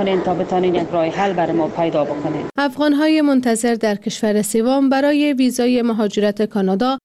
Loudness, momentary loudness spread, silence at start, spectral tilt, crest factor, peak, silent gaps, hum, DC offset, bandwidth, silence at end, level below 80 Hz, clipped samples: -17 LUFS; 5 LU; 0 s; -5 dB/octave; 10 dB; -6 dBFS; none; none; under 0.1%; 14.5 kHz; 0.05 s; -54 dBFS; under 0.1%